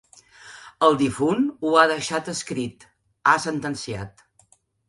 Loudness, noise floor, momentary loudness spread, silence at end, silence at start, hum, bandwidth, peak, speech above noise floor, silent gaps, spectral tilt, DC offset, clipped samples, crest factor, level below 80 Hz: -22 LUFS; -60 dBFS; 16 LU; 0.8 s; 0.45 s; none; 11.5 kHz; -2 dBFS; 38 dB; none; -4.5 dB/octave; under 0.1%; under 0.1%; 22 dB; -58 dBFS